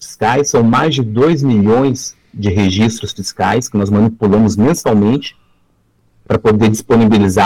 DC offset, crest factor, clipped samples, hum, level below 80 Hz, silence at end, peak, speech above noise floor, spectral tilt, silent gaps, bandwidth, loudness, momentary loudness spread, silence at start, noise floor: 0.3%; 8 dB; under 0.1%; none; -40 dBFS; 0 s; -4 dBFS; 44 dB; -6 dB/octave; none; 15 kHz; -13 LUFS; 8 LU; 0 s; -56 dBFS